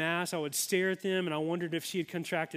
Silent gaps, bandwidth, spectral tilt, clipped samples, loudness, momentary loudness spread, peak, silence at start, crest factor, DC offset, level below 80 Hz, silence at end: none; 16 kHz; -4 dB/octave; under 0.1%; -32 LUFS; 5 LU; -16 dBFS; 0 s; 18 dB; under 0.1%; -80 dBFS; 0 s